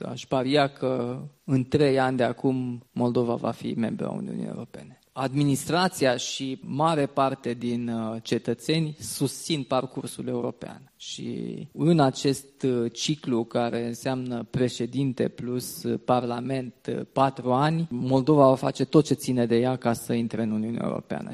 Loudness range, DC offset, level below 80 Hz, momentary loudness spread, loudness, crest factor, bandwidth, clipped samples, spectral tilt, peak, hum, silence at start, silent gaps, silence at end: 5 LU; under 0.1%; -62 dBFS; 11 LU; -26 LUFS; 22 dB; 14.5 kHz; under 0.1%; -6 dB/octave; -4 dBFS; none; 0 s; none; 0 s